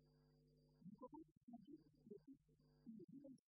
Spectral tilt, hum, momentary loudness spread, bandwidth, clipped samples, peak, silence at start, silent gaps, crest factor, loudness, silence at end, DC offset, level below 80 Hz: -9 dB/octave; none; 5 LU; 5 kHz; under 0.1%; -48 dBFS; 0 s; 1.32-1.48 s, 3.04-3.08 s; 18 dB; -64 LUFS; 0.1 s; under 0.1%; -88 dBFS